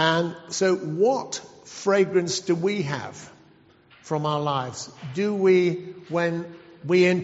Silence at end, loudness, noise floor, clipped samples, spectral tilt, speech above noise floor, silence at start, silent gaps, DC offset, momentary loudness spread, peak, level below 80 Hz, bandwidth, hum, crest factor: 0 s; -24 LUFS; -55 dBFS; under 0.1%; -4.5 dB/octave; 32 dB; 0 s; none; under 0.1%; 15 LU; -6 dBFS; -68 dBFS; 8 kHz; none; 18 dB